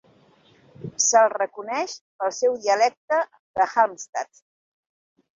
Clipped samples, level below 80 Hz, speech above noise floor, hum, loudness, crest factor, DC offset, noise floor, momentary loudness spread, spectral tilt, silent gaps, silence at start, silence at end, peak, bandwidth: under 0.1%; -70 dBFS; 35 dB; none; -23 LUFS; 20 dB; under 0.1%; -57 dBFS; 14 LU; -1.5 dB/octave; 2.01-2.19 s, 2.97-3.08 s, 3.39-3.54 s, 4.09-4.13 s; 0.8 s; 1.15 s; -4 dBFS; 7.8 kHz